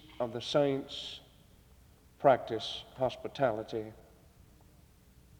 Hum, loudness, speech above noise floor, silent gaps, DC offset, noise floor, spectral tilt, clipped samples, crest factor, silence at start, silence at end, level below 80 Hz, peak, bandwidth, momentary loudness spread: none; -33 LUFS; 28 dB; none; under 0.1%; -61 dBFS; -5.5 dB/octave; under 0.1%; 24 dB; 0.1 s; 1.4 s; -64 dBFS; -12 dBFS; over 20 kHz; 13 LU